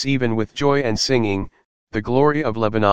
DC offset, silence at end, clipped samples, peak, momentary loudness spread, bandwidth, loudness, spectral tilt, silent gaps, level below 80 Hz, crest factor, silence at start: 2%; 0 s; under 0.1%; 0 dBFS; 10 LU; 9.6 kHz; -20 LUFS; -5.5 dB/octave; 1.65-1.87 s; -44 dBFS; 18 dB; 0 s